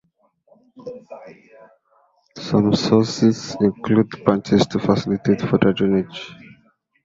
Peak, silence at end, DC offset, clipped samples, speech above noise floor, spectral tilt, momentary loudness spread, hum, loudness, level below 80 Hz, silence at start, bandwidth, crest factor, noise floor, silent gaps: -2 dBFS; 0.7 s; under 0.1%; under 0.1%; 43 dB; -6.5 dB/octave; 20 LU; none; -19 LUFS; -52 dBFS; 0.8 s; 7.8 kHz; 18 dB; -62 dBFS; none